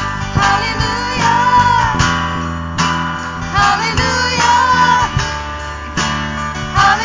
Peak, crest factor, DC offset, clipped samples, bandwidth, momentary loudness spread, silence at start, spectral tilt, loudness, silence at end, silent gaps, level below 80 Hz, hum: 0 dBFS; 14 dB; under 0.1%; under 0.1%; 7.6 kHz; 10 LU; 0 s; -3.5 dB/octave; -14 LUFS; 0 s; none; -28 dBFS; none